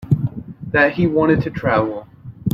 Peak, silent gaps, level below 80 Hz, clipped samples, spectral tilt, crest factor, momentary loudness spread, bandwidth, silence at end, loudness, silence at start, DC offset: -2 dBFS; none; -44 dBFS; under 0.1%; -8.5 dB/octave; 16 dB; 12 LU; 6 kHz; 0 s; -18 LUFS; 0 s; under 0.1%